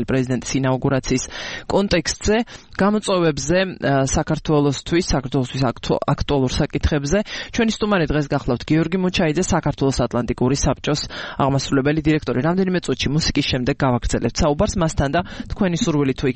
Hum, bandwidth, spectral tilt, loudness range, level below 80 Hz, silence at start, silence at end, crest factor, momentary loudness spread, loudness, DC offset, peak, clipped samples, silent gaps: none; 8.8 kHz; -5.5 dB/octave; 1 LU; -34 dBFS; 0 s; 0 s; 14 dB; 4 LU; -20 LUFS; 0.2%; -4 dBFS; under 0.1%; none